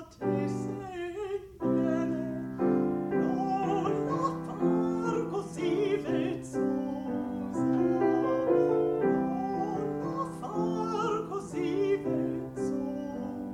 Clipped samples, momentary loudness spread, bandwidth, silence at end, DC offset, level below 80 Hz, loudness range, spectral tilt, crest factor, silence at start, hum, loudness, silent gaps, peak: under 0.1%; 8 LU; 11.5 kHz; 0 s; under 0.1%; -60 dBFS; 3 LU; -7.5 dB/octave; 16 dB; 0 s; none; -30 LUFS; none; -14 dBFS